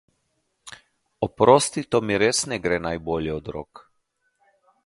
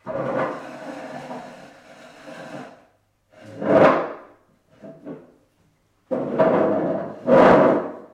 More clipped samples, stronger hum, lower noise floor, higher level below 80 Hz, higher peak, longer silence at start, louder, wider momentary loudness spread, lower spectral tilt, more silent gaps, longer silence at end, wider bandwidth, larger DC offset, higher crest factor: neither; neither; first, -73 dBFS vs -63 dBFS; first, -50 dBFS vs -58 dBFS; first, 0 dBFS vs -4 dBFS; first, 0.65 s vs 0.05 s; second, -22 LUFS vs -19 LUFS; second, 21 LU vs 25 LU; second, -4 dB/octave vs -7.5 dB/octave; neither; first, 1.25 s vs 0.1 s; first, 11.5 kHz vs 9.6 kHz; neither; first, 24 dB vs 18 dB